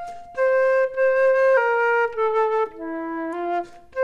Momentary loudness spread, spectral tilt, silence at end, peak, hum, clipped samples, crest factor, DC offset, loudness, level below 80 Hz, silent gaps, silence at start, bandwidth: 11 LU; -4.5 dB/octave; 0 s; -8 dBFS; none; under 0.1%; 12 dB; under 0.1%; -21 LUFS; -58 dBFS; none; 0 s; 7 kHz